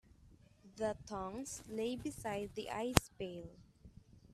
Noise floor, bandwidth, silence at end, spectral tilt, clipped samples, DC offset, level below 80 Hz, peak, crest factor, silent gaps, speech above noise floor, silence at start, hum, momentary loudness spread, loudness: -64 dBFS; 15.5 kHz; 0 s; -4.5 dB/octave; under 0.1%; under 0.1%; -56 dBFS; -2 dBFS; 40 dB; none; 24 dB; 0.2 s; none; 17 LU; -40 LUFS